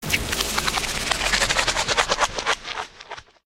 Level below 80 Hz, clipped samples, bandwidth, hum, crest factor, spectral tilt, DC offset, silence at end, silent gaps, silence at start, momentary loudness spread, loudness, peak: -38 dBFS; under 0.1%; 16.5 kHz; none; 22 dB; -1 dB/octave; under 0.1%; 0.25 s; none; 0 s; 13 LU; -22 LUFS; -2 dBFS